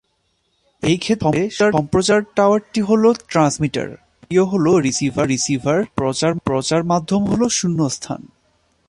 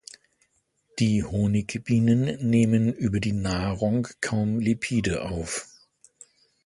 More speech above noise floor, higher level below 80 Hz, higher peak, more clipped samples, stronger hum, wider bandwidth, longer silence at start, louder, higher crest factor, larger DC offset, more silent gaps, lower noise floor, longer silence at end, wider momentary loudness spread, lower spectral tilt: about the same, 49 dB vs 46 dB; about the same, -48 dBFS vs -46 dBFS; first, -2 dBFS vs -8 dBFS; neither; neither; about the same, 11.5 kHz vs 11.5 kHz; second, 0.8 s vs 0.95 s; first, -18 LUFS vs -25 LUFS; about the same, 16 dB vs 16 dB; neither; neither; about the same, -67 dBFS vs -69 dBFS; second, 0.65 s vs 1 s; second, 6 LU vs 9 LU; about the same, -5 dB/octave vs -6 dB/octave